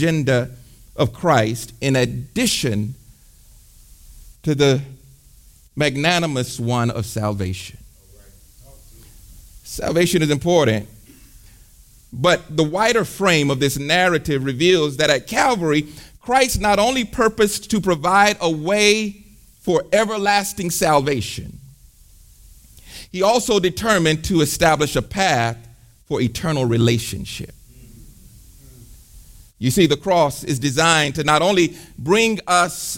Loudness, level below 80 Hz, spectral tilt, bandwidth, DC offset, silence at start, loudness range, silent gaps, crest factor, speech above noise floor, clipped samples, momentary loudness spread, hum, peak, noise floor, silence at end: -18 LUFS; -42 dBFS; -4.5 dB/octave; 17 kHz; under 0.1%; 0 s; 6 LU; none; 18 dB; 30 dB; under 0.1%; 12 LU; none; -2 dBFS; -48 dBFS; 0 s